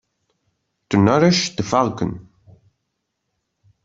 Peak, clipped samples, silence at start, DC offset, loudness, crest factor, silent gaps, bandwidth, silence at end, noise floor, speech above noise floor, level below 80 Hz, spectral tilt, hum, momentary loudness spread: -2 dBFS; under 0.1%; 0.9 s; under 0.1%; -18 LUFS; 20 dB; none; 7.8 kHz; 1.65 s; -76 dBFS; 59 dB; -54 dBFS; -5.5 dB/octave; none; 13 LU